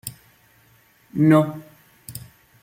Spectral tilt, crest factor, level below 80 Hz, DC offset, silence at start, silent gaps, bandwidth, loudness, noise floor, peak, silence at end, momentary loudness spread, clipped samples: -7.5 dB/octave; 20 dB; -60 dBFS; under 0.1%; 0.05 s; none; 16.5 kHz; -19 LUFS; -57 dBFS; -4 dBFS; 0.45 s; 23 LU; under 0.1%